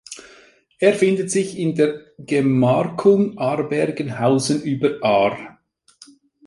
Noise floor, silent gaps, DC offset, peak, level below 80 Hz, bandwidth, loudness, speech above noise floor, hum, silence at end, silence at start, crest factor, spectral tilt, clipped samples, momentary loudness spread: -55 dBFS; none; under 0.1%; -2 dBFS; -60 dBFS; 11.5 kHz; -19 LUFS; 37 dB; none; 0.95 s; 0.1 s; 18 dB; -6 dB/octave; under 0.1%; 7 LU